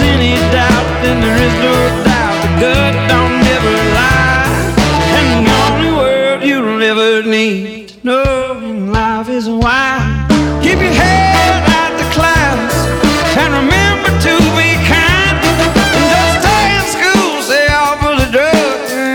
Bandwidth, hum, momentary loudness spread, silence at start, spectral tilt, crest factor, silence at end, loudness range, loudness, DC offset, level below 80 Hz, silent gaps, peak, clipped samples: over 20 kHz; none; 5 LU; 0 s; -4.5 dB/octave; 10 dB; 0 s; 3 LU; -10 LUFS; under 0.1%; -22 dBFS; none; 0 dBFS; under 0.1%